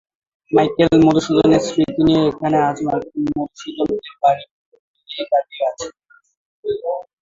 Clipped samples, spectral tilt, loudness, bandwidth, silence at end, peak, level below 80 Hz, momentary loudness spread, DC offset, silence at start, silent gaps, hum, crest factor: under 0.1%; -6 dB/octave; -18 LUFS; 7.8 kHz; 0.2 s; -2 dBFS; -48 dBFS; 13 LU; under 0.1%; 0.5 s; 4.51-4.72 s, 4.79-4.94 s, 6.37-6.63 s; none; 18 dB